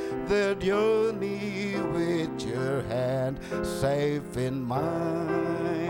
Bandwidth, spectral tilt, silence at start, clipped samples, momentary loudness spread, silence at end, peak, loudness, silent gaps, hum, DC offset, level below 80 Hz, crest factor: 16.5 kHz; -6.5 dB/octave; 0 s; under 0.1%; 6 LU; 0 s; -14 dBFS; -28 LUFS; none; none; under 0.1%; -52 dBFS; 14 dB